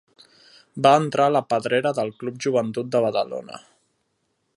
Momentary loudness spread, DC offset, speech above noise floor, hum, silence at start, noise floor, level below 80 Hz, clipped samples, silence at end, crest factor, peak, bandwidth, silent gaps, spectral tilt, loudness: 16 LU; under 0.1%; 51 dB; none; 0.75 s; -72 dBFS; -70 dBFS; under 0.1%; 1 s; 20 dB; -2 dBFS; 11.5 kHz; none; -5.5 dB/octave; -22 LUFS